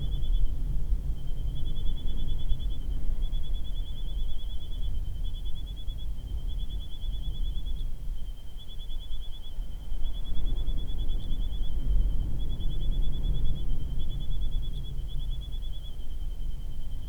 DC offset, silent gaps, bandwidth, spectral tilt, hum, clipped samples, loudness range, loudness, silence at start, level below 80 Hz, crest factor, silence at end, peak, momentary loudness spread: under 0.1%; none; 3.7 kHz; -6.5 dB/octave; none; under 0.1%; 5 LU; -37 LUFS; 0 s; -28 dBFS; 14 dB; 0 s; -10 dBFS; 8 LU